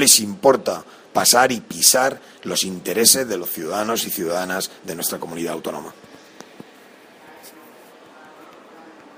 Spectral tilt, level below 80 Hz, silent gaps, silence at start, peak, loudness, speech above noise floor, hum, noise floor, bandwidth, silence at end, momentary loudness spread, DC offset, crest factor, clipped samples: -1.5 dB/octave; -64 dBFS; none; 0 s; 0 dBFS; -18 LUFS; 27 dB; none; -47 dBFS; 16 kHz; 0.25 s; 15 LU; under 0.1%; 22 dB; under 0.1%